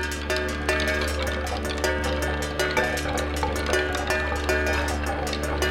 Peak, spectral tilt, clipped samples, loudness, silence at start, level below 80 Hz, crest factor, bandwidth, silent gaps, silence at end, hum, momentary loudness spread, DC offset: -6 dBFS; -4 dB/octave; under 0.1%; -25 LUFS; 0 s; -34 dBFS; 18 dB; 17 kHz; none; 0 s; none; 4 LU; under 0.1%